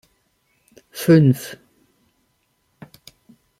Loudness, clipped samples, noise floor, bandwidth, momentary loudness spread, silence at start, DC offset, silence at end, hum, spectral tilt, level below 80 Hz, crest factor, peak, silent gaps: -16 LUFS; under 0.1%; -67 dBFS; 16 kHz; 24 LU; 0.95 s; under 0.1%; 2.05 s; none; -7.5 dB/octave; -62 dBFS; 20 dB; -2 dBFS; none